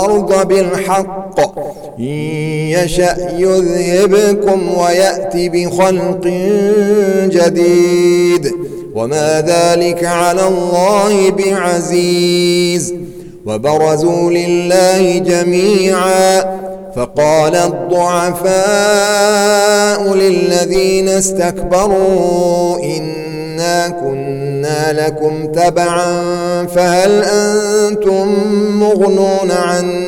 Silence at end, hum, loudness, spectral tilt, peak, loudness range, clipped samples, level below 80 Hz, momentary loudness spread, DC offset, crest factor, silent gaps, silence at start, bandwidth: 0 s; none; -12 LUFS; -4.5 dB/octave; 0 dBFS; 4 LU; under 0.1%; -40 dBFS; 8 LU; under 0.1%; 12 dB; none; 0 s; 17.5 kHz